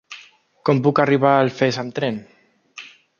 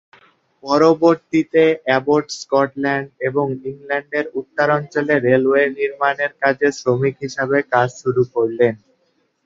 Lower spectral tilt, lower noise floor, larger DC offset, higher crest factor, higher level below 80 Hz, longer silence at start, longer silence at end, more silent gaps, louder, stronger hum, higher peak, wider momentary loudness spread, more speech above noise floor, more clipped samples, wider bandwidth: about the same, -6.5 dB/octave vs -6 dB/octave; second, -48 dBFS vs -64 dBFS; neither; about the same, 18 dB vs 16 dB; about the same, -64 dBFS vs -62 dBFS; second, 0.1 s vs 0.65 s; second, 0.35 s vs 0.7 s; neither; about the same, -19 LUFS vs -18 LUFS; neither; about the same, -2 dBFS vs -2 dBFS; first, 23 LU vs 8 LU; second, 30 dB vs 47 dB; neither; about the same, 7.2 kHz vs 7.8 kHz